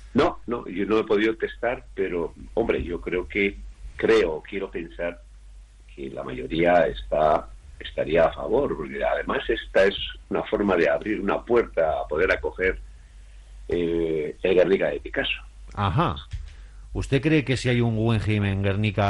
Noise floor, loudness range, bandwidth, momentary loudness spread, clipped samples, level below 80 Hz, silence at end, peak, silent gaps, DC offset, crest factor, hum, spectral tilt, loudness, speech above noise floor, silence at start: -46 dBFS; 3 LU; 11 kHz; 12 LU; under 0.1%; -42 dBFS; 0 s; -8 dBFS; none; under 0.1%; 16 dB; none; -7 dB/octave; -24 LUFS; 22 dB; 0 s